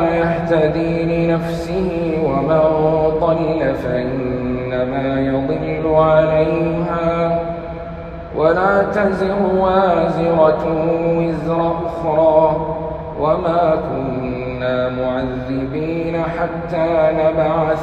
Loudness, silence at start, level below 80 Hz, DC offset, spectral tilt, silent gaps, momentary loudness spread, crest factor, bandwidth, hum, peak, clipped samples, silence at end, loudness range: -17 LUFS; 0 s; -36 dBFS; under 0.1%; -8.5 dB/octave; none; 8 LU; 16 dB; 8.6 kHz; none; 0 dBFS; under 0.1%; 0 s; 4 LU